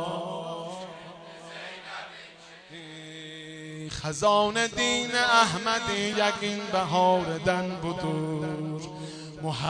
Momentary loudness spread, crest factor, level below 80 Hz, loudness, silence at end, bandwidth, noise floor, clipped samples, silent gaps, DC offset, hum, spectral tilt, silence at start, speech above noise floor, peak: 20 LU; 24 dB; -58 dBFS; -26 LUFS; 0 s; 10 kHz; -49 dBFS; under 0.1%; none; under 0.1%; none; -4 dB/octave; 0 s; 23 dB; -4 dBFS